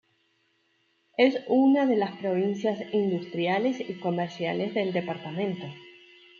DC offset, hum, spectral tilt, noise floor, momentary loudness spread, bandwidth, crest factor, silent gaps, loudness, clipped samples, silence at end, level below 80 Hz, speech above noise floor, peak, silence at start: under 0.1%; none; -7 dB/octave; -70 dBFS; 10 LU; 7 kHz; 18 dB; none; -27 LUFS; under 0.1%; 0.5 s; -78 dBFS; 44 dB; -10 dBFS; 1.2 s